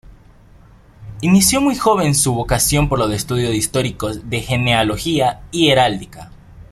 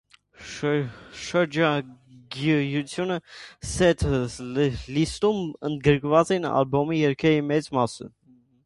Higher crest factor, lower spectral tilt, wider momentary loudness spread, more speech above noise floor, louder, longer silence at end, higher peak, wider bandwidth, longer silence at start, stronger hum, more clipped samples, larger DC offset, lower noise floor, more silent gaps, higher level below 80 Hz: about the same, 16 dB vs 20 dB; second, -4 dB/octave vs -6 dB/octave; second, 9 LU vs 16 LU; first, 29 dB vs 21 dB; first, -16 LUFS vs -24 LUFS; second, 0.1 s vs 0.55 s; about the same, -2 dBFS vs -4 dBFS; first, 15.5 kHz vs 11.5 kHz; first, 1 s vs 0.4 s; neither; neither; neither; about the same, -45 dBFS vs -44 dBFS; neither; first, -36 dBFS vs -44 dBFS